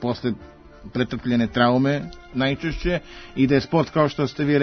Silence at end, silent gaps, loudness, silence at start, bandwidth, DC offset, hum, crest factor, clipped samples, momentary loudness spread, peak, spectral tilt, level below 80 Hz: 0 s; none; -22 LUFS; 0 s; 6.6 kHz; under 0.1%; none; 18 dB; under 0.1%; 10 LU; -4 dBFS; -7.5 dB/octave; -42 dBFS